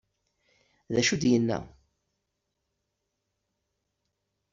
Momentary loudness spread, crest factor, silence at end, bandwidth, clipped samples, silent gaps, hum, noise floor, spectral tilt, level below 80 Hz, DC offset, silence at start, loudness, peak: 8 LU; 22 dB; 2.85 s; 7.6 kHz; under 0.1%; none; none; -81 dBFS; -4.5 dB/octave; -62 dBFS; under 0.1%; 0.9 s; -26 LUFS; -12 dBFS